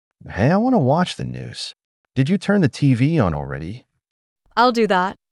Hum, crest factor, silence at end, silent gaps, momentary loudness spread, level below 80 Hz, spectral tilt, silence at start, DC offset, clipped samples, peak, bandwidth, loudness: none; 16 dB; 0.25 s; 1.84-2.04 s, 4.11-4.36 s; 14 LU; -48 dBFS; -7 dB/octave; 0.25 s; under 0.1%; under 0.1%; -2 dBFS; 11.5 kHz; -19 LUFS